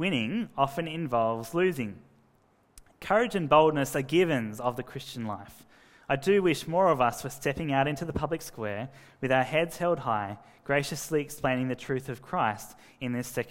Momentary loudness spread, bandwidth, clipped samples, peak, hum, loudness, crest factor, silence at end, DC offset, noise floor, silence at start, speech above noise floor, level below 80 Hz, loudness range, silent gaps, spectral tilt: 14 LU; 16 kHz; under 0.1%; -8 dBFS; none; -28 LUFS; 20 dB; 0 s; under 0.1%; -65 dBFS; 0 s; 37 dB; -58 dBFS; 3 LU; none; -5.5 dB/octave